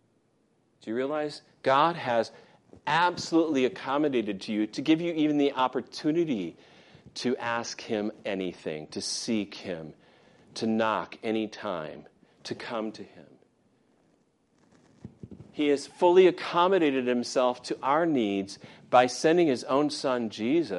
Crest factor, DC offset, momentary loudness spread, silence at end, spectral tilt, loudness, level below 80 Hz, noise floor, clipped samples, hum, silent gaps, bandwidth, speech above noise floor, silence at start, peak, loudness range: 20 dB; under 0.1%; 15 LU; 0 s; -5 dB/octave; -27 LUFS; -74 dBFS; -69 dBFS; under 0.1%; none; none; 11.5 kHz; 42 dB; 0.85 s; -8 dBFS; 11 LU